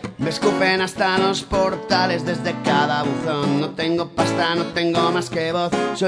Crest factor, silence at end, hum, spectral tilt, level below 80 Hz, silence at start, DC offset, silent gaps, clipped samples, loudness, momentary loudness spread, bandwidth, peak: 16 dB; 0 s; none; -5 dB/octave; -46 dBFS; 0 s; under 0.1%; none; under 0.1%; -20 LUFS; 4 LU; 11 kHz; -4 dBFS